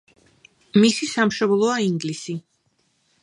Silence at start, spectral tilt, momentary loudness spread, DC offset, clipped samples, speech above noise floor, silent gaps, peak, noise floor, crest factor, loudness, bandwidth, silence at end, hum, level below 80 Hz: 0.75 s; -5 dB/octave; 13 LU; under 0.1%; under 0.1%; 47 dB; none; -4 dBFS; -67 dBFS; 18 dB; -20 LUFS; 11.5 kHz; 0.8 s; none; -66 dBFS